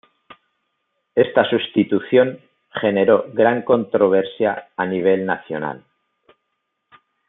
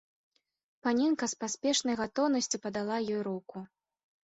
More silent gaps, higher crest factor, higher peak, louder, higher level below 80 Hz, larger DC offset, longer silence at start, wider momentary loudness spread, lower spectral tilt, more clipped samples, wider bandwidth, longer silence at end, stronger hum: neither; about the same, 18 dB vs 16 dB; first, -2 dBFS vs -16 dBFS; first, -18 LUFS vs -31 LUFS; about the same, -68 dBFS vs -72 dBFS; neither; first, 1.15 s vs 0.85 s; about the same, 9 LU vs 9 LU; first, -10.5 dB/octave vs -3 dB/octave; neither; second, 4 kHz vs 8.2 kHz; first, 1.5 s vs 0.55 s; neither